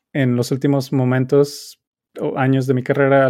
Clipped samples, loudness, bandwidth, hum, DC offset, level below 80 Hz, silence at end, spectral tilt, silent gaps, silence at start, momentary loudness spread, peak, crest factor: under 0.1%; -18 LUFS; 15 kHz; none; under 0.1%; -66 dBFS; 0 s; -7 dB/octave; 1.87-1.92 s; 0.15 s; 10 LU; -2 dBFS; 16 dB